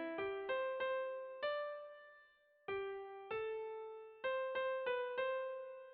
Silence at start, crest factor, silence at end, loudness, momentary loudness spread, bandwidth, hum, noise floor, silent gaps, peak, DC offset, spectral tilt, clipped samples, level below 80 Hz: 0 s; 14 dB; 0 s; -43 LUFS; 11 LU; 4.8 kHz; none; -69 dBFS; none; -30 dBFS; under 0.1%; -0.5 dB/octave; under 0.1%; -82 dBFS